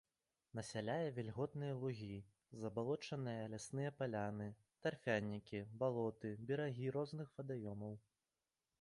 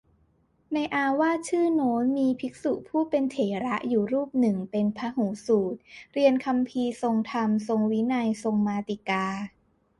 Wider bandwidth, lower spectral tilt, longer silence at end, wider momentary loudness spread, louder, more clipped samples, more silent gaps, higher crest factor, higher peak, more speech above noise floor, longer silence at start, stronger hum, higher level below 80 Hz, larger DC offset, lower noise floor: about the same, 11 kHz vs 11.5 kHz; about the same, -6.5 dB/octave vs -6.5 dB/octave; first, 0.8 s vs 0.5 s; first, 10 LU vs 7 LU; second, -45 LUFS vs -26 LUFS; neither; neither; about the same, 20 dB vs 16 dB; second, -26 dBFS vs -10 dBFS; first, over 45 dB vs 40 dB; second, 0.55 s vs 0.7 s; neither; second, -76 dBFS vs -66 dBFS; neither; first, under -90 dBFS vs -66 dBFS